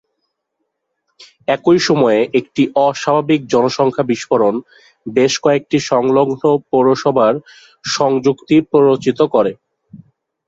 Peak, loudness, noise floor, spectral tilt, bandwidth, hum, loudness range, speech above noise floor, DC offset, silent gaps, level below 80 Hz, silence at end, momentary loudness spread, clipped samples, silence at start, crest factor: -2 dBFS; -14 LUFS; -73 dBFS; -5.5 dB/octave; 7.8 kHz; none; 1 LU; 59 dB; under 0.1%; none; -58 dBFS; 0.5 s; 7 LU; under 0.1%; 1.2 s; 14 dB